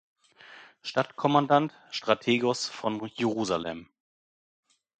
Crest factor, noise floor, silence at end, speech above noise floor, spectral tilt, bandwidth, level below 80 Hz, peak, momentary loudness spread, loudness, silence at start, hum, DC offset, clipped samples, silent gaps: 24 dB; -52 dBFS; 1.15 s; 25 dB; -5 dB/octave; 9.4 kHz; -68 dBFS; -6 dBFS; 10 LU; -28 LUFS; 0.5 s; none; under 0.1%; under 0.1%; none